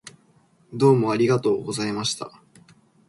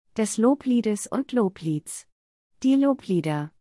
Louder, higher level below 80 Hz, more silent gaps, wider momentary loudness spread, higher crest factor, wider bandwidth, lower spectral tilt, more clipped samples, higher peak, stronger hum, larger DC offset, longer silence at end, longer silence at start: about the same, -22 LUFS vs -24 LUFS; about the same, -64 dBFS vs -68 dBFS; second, none vs 2.12-2.50 s; first, 15 LU vs 9 LU; about the same, 18 dB vs 16 dB; about the same, 11.5 kHz vs 12 kHz; about the same, -5.5 dB/octave vs -6 dB/octave; neither; first, -6 dBFS vs -10 dBFS; neither; neither; first, 0.8 s vs 0.15 s; about the same, 0.05 s vs 0.15 s